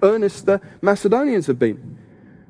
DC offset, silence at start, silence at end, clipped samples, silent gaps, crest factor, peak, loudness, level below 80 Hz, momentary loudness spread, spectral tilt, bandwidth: under 0.1%; 0 s; 0.55 s; under 0.1%; none; 18 dB; -2 dBFS; -19 LUFS; -58 dBFS; 4 LU; -6.5 dB/octave; 10.5 kHz